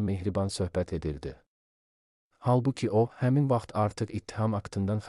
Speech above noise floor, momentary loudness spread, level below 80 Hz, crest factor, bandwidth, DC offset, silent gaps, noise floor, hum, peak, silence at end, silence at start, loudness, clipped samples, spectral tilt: over 62 dB; 8 LU; -52 dBFS; 16 dB; 12 kHz; under 0.1%; 1.47-2.31 s; under -90 dBFS; none; -14 dBFS; 0 s; 0 s; -29 LUFS; under 0.1%; -7.5 dB/octave